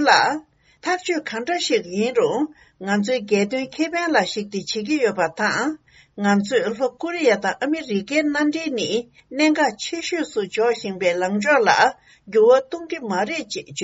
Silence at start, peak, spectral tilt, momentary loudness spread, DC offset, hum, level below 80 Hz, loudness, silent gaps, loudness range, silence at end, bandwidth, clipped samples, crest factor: 0 s; -2 dBFS; -2.5 dB/octave; 10 LU; under 0.1%; none; -64 dBFS; -21 LUFS; none; 3 LU; 0 s; 8 kHz; under 0.1%; 20 dB